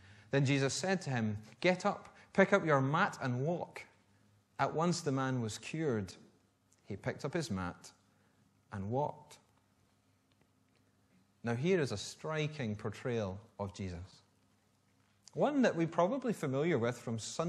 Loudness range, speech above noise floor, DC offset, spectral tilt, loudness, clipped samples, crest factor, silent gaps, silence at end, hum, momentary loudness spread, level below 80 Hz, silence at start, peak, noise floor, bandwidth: 9 LU; 38 dB; under 0.1%; -5.5 dB/octave; -35 LUFS; under 0.1%; 24 dB; none; 0 s; none; 14 LU; -72 dBFS; 0.1 s; -12 dBFS; -73 dBFS; 13 kHz